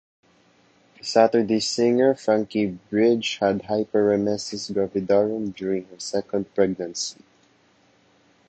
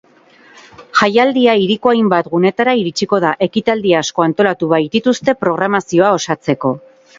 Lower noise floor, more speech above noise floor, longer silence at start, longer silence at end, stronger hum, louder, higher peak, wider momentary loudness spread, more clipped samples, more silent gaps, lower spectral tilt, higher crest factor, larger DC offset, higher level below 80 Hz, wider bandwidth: first, -60 dBFS vs -46 dBFS; first, 38 dB vs 33 dB; first, 1.05 s vs 0.8 s; first, 1.35 s vs 0.4 s; neither; second, -23 LUFS vs -14 LUFS; second, -4 dBFS vs 0 dBFS; first, 9 LU vs 5 LU; neither; neither; about the same, -4.5 dB/octave vs -5 dB/octave; first, 20 dB vs 14 dB; neither; second, -62 dBFS vs -56 dBFS; first, 9 kHz vs 7.8 kHz